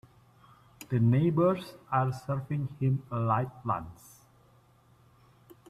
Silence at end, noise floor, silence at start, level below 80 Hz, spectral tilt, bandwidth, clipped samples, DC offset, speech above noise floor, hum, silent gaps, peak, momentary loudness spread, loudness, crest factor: 1.75 s; -62 dBFS; 0.8 s; -64 dBFS; -8.5 dB/octave; 14 kHz; under 0.1%; under 0.1%; 33 dB; none; none; -12 dBFS; 10 LU; -30 LUFS; 18 dB